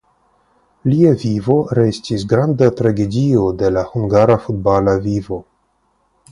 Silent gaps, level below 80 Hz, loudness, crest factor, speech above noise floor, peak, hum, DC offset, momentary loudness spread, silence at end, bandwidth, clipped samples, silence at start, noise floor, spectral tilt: none; -42 dBFS; -15 LUFS; 16 dB; 47 dB; 0 dBFS; none; under 0.1%; 8 LU; 0.9 s; 11 kHz; under 0.1%; 0.85 s; -62 dBFS; -8 dB/octave